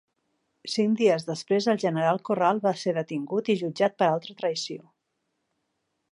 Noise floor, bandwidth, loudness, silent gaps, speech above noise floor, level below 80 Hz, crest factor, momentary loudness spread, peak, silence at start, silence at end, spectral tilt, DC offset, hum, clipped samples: -78 dBFS; 11 kHz; -26 LUFS; none; 53 dB; -78 dBFS; 18 dB; 8 LU; -8 dBFS; 0.65 s; 1.3 s; -5.5 dB/octave; under 0.1%; none; under 0.1%